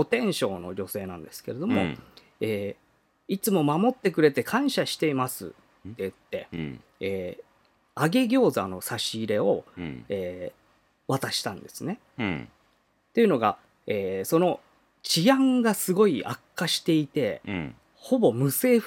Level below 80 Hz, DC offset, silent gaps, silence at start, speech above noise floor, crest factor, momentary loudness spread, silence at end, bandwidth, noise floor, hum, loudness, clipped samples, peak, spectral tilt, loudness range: -66 dBFS; under 0.1%; none; 0 s; 42 dB; 20 dB; 16 LU; 0 s; 17.5 kHz; -67 dBFS; none; -26 LUFS; under 0.1%; -6 dBFS; -5 dB/octave; 7 LU